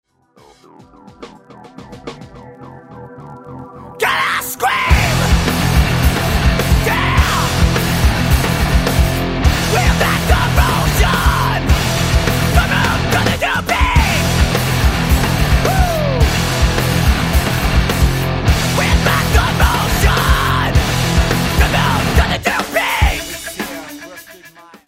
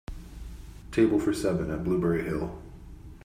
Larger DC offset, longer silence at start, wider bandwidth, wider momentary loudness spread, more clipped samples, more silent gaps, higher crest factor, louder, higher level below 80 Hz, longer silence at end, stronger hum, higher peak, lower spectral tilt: neither; first, 1.05 s vs 0.1 s; about the same, 16.5 kHz vs 15 kHz; second, 11 LU vs 23 LU; neither; neither; about the same, 14 dB vs 18 dB; first, -14 LUFS vs -28 LUFS; first, -20 dBFS vs -44 dBFS; first, 0.4 s vs 0 s; neither; first, 0 dBFS vs -12 dBFS; second, -4.5 dB/octave vs -7 dB/octave